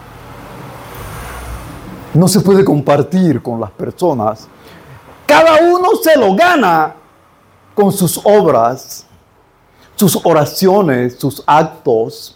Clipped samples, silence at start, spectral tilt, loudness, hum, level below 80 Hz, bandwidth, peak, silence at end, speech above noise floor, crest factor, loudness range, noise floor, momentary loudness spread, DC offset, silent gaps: under 0.1%; 0.15 s; -5.5 dB/octave; -11 LUFS; none; -42 dBFS; 17 kHz; 0 dBFS; 0.05 s; 38 dB; 12 dB; 3 LU; -49 dBFS; 21 LU; under 0.1%; none